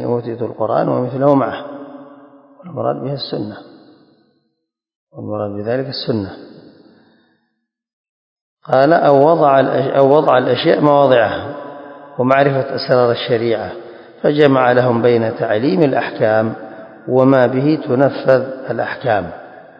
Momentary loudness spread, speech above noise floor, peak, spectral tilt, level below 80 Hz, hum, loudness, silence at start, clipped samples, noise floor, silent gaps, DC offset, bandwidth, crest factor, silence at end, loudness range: 18 LU; 58 dB; 0 dBFS; -9 dB/octave; -56 dBFS; none; -15 LUFS; 0 s; under 0.1%; -72 dBFS; 4.95-5.07 s, 7.93-8.57 s; under 0.1%; 5.6 kHz; 16 dB; 0.2 s; 13 LU